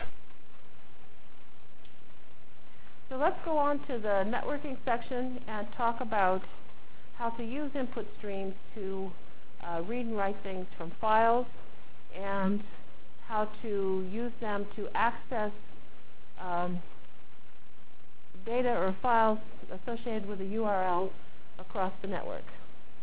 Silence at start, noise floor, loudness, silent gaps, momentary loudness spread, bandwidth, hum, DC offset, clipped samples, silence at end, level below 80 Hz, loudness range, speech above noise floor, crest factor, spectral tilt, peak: 0 s; -60 dBFS; -33 LUFS; none; 15 LU; 4 kHz; none; 4%; under 0.1%; 0.25 s; -60 dBFS; 6 LU; 28 dB; 20 dB; -9.5 dB/octave; -14 dBFS